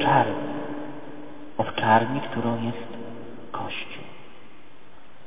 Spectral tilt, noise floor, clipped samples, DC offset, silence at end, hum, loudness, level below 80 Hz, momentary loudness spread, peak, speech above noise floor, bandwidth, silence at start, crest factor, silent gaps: -4 dB/octave; -52 dBFS; under 0.1%; 2%; 0.7 s; none; -26 LUFS; -62 dBFS; 21 LU; -6 dBFS; 28 dB; 3.9 kHz; 0 s; 22 dB; none